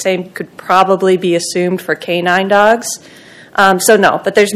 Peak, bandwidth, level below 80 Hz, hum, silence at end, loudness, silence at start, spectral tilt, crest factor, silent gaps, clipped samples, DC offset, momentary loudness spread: 0 dBFS; 15.5 kHz; -56 dBFS; none; 0 s; -12 LUFS; 0 s; -4 dB/octave; 12 dB; none; 1%; under 0.1%; 12 LU